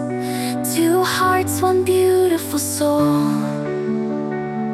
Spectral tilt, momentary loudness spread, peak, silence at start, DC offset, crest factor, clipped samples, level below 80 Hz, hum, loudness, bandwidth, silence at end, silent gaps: -5 dB/octave; 7 LU; -4 dBFS; 0 s; under 0.1%; 14 dB; under 0.1%; -58 dBFS; none; -18 LUFS; 16 kHz; 0 s; none